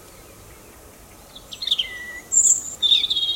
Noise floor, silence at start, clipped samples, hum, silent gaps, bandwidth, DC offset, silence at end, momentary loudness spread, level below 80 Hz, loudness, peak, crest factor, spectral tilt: -45 dBFS; 0.1 s; under 0.1%; none; none; 16.5 kHz; under 0.1%; 0 s; 16 LU; -54 dBFS; -18 LUFS; -4 dBFS; 18 dB; 2.5 dB/octave